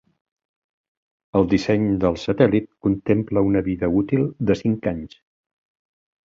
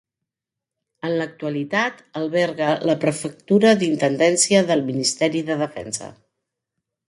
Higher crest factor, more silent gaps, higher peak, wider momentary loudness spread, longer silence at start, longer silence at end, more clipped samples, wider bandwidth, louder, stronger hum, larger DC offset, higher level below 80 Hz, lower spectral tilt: about the same, 20 dB vs 18 dB; neither; about the same, -2 dBFS vs -2 dBFS; second, 6 LU vs 13 LU; first, 1.35 s vs 1.05 s; first, 1.2 s vs 0.95 s; neither; second, 7.6 kHz vs 11.5 kHz; about the same, -21 LUFS vs -20 LUFS; neither; neither; first, -46 dBFS vs -64 dBFS; first, -8 dB/octave vs -4 dB/octave